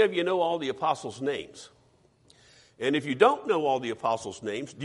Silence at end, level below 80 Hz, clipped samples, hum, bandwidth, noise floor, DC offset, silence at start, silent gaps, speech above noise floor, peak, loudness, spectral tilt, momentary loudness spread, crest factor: 0 s; -70 dBFS; under 0.1%; none; 11.5 kHz; -63 dBFS; under 0.1%; 0 s; none; 36 dB; -6 dBFS; -28 LUFS; -4.5 dB/octave; 12 LU; 22 dB